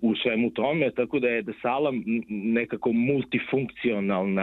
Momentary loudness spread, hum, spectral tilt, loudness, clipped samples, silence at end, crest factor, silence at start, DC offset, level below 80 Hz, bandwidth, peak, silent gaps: 4 LU; none; -9 dB/octave; -26 LUFS; under 0.1%; 0 s; 16 dB; 0 s; under 0.1%; -62 dBFS; 4.1 kHz; -10 dBFS; none